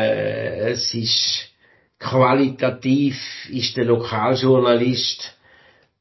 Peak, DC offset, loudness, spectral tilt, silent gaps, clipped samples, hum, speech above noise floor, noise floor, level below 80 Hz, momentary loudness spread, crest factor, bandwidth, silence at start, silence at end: -2 dBFS; under 0.1%; -19 LUFS; -5 dB/octave; none; under 0.1%; none; 39 dB; -58 dBFS; -56 dBFS; 12 LU; 18 dB; 6.2 kHz; 0 s; 0.7 s